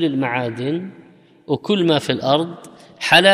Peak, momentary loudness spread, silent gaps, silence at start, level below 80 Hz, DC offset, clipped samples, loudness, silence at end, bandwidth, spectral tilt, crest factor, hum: 0 dBFS; 13 LU; none; 0 s; -66 dBFS; under 0.1%; under 0.1%; -19 LUFS; 0 s; 15 kHz; -4.5 dB/octave; 18 dB; none